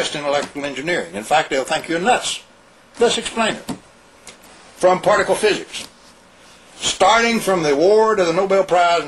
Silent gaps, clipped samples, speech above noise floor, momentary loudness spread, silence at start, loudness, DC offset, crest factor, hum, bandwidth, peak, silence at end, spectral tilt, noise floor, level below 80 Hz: none; under 0.1%; 31 dB; 12 LU; 0 s; -17 LUFS; under 0.1%; 16 dB; none; 14 kHz; -2 dBFS; 0 s; -3 dB/octave; -48 dBFS; -52 dBFS